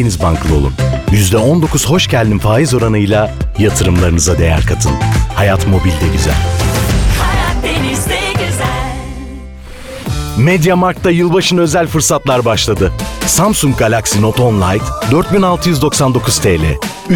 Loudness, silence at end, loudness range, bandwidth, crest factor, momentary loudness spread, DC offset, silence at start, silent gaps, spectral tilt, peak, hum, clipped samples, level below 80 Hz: -12 LUFS; 0 s; 4 LU; 19.5 kHz; 10 dB; 6 LU; under 0.1%; 0 s; none; -5 dB/octave; -2 dBFS; none; under 0.1%; -20 dBFS